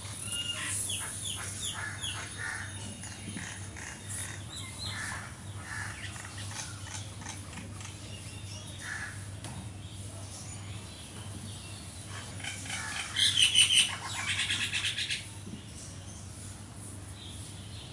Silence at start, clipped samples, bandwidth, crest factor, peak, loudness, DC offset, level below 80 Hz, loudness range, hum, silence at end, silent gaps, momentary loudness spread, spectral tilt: 0 s; under 0.1%; 11.5 kHz; 26 dB; -10 dBFS; -33 LUFS; under 0.1%; -56 dBFS; 15 LU; none; 0 s; none; 15 LU; -1 dB/octave